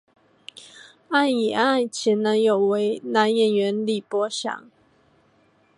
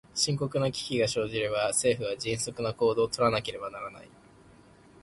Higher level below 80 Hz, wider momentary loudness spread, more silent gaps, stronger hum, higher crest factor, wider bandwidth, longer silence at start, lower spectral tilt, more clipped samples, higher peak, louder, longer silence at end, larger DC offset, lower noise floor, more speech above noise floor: second, -76 dBFS vs -58 dBFS; first, 17 LU vs 11 LU; neither; neither; about the same, 20 dB vs 18 dB; about the same, 11.5 kHz vs 11.5 kHz; first, 0.75 s vs 0.15 s; about the same, -4.5 dB/octave vs -3.5 dB/octave; neither; first, -4 dBFS vs -12 dBFS; first, -22 LUFS vs -28 LUFS; first, 1.15 s vs 0.95 s; neither; first, -61 dBFS vs -56 dBFS; first, 39 dB vs 27 dB